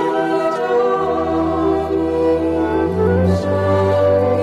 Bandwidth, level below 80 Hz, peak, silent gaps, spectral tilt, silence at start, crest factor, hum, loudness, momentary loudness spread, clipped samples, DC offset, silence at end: 12 kHz; -38 dBFS; -6 dBFS; none; -8 dB/octave; 0 s; 10 dB; none; -17 LUFS; 3 LU; under 0.1%; under 0.1%; 0 s